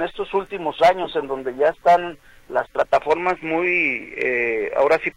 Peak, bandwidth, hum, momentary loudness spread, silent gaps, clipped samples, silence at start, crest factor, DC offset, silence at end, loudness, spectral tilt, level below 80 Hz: -6 dBFS; 11.5 kHz; none; 8 LU; none; under 0.1%; 0 s; 14 dB; under 0.1%; 0.05 s; -20 LUFS; -5 dB/octave; -52 dBFS